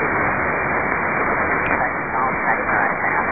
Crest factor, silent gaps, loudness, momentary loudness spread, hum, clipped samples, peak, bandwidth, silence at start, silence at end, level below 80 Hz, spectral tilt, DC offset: 18 dB; none; -19 LUFS; 2 LU; none; under 0.1%; -2 dBFS; 3.8 kHz; 0 s; 0 s; -42 dBFS; -12 dB/octave; 0.7%